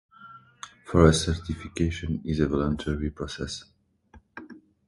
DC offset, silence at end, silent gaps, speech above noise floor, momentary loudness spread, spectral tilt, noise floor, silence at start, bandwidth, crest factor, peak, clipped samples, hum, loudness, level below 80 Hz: under 0.1%; 0.3 s; none; 31 dB; 25 LU; -6 dB/octave; -56 dBFS; 0.2 s; 11.5 kHz; 24 dB; -2 dBFS; under 0.1%; none; -26 LUFS; -38 dBFS